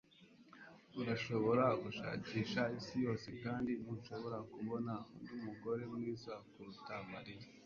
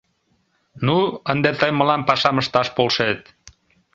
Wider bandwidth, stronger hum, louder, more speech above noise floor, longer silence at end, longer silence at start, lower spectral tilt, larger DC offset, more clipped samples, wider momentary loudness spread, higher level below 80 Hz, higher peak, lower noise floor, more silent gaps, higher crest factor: about the same, 7.2 kHz vs 7.8 kHz; neither; second, -42 LUFS vs -19 LUFS; second, 23 dB vs 47 dB; second, 0 s vs 0.75 s; second, 0.2 s vs 0.75 s; about the same, -5.5 dB/octave vs -5.5 dB/octave; neither; neither; first, 16 LU vs 5 LU; second, -72 dBFS vs -56 dBFS; second, -20 dBFS vs -2 dBFS; about the same, -65 dBFS vs -66 dBFS; neither; about the same, 22 dB vs 20 dB